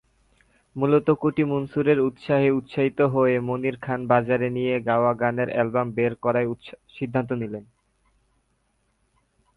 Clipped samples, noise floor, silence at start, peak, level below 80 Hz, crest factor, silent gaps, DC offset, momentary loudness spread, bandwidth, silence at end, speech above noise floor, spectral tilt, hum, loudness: under 0.1%; -69 dBFS; 0.75 s; -4 dBFS; -60 dBFS; 20 dB; none; under 0.1%; 9 LU; 10.5 kHz; 1.95 s; 47 dB; -9.5 dB/octave; none; -23 LUFS